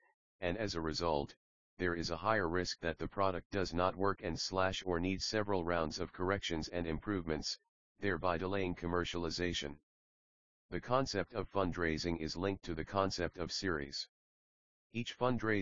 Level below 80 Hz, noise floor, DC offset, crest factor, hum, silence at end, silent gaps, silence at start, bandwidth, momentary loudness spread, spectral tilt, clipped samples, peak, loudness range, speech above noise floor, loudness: -56 dBFS; under -90 dBFS; 0.2%; 20 dB; none; 0 s; 0.14-0.39 s, 1.37-1.77 s, 3.45-3.50 s, 7.69-7.95 s, 9.83-10.69 s, 14.09-14.90 s; 0 s; 7.4 kHz; 7 LU; -4 dB/octave; under 0.1%; -16 dBFS; 3 LU; over 53 dB; -37 LUFS